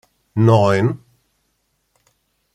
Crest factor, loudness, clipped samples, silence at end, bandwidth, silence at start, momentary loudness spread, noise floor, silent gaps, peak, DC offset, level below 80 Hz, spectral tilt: 18 dB; -16 LUFS; under 0.1%; 1.6 s; 9.2 kHz; 0.35 s; 15 LU; -68 dBFS; none; -2 dBFS; under 0.1%; -56 dBFS; -8 dB/octave